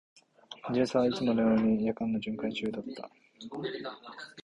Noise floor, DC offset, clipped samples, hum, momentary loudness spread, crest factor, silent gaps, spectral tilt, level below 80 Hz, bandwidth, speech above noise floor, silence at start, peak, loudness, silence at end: -50 dBFS; under 0.1%; under 0.1%; none; 19 LU; 18 dB; none; -6.5 dB/octave; -64 dBFS; 8.4 kHz; 20 dB; 0.5 s; -14 dBFS; -30 LUFS; 0.05 s